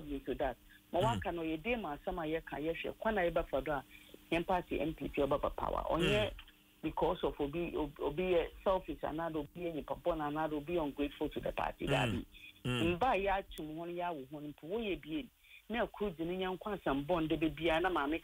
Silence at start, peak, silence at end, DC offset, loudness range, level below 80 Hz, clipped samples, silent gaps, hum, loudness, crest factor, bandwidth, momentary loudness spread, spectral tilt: 0 s; -20 dBFS; 0 s; under 0.1%; 3 LU; -52 dBFS; under 0.1%; none; none; -37 LUFS; 16 dB; 16 kHz; 9 LU; -6 dB/octave